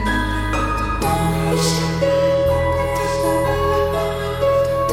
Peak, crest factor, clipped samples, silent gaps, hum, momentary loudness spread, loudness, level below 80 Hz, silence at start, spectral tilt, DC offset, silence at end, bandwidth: -6 dBFS; 12 dB; under 0.1%; none; none; 4 LU; -19 LUFS; -30 dBFS; 0 s; -5.5 dB/octave; under 0.1%; 0 s; 17 kHz